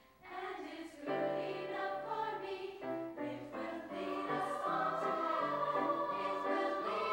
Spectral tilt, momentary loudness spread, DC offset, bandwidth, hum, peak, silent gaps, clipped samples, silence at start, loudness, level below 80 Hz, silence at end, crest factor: -5.5 dB/octave; 9 LU; under 0.1%; 16 kHz; none; -24 dBFS; none; under 0.1%; 0.2 s; -39 LUFS; -78 dBFS; 0 s; 14 dB